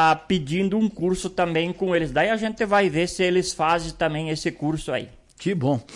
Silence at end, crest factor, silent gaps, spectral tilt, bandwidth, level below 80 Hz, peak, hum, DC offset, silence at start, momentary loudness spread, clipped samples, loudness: 0 s; 14 dB; none; -5 dB/octave; 11.5 kHz; -48 dBFS; -10 dBFS; none; under 0.1%; 0 s; 7 LU; under 0.1%; -23 LUFS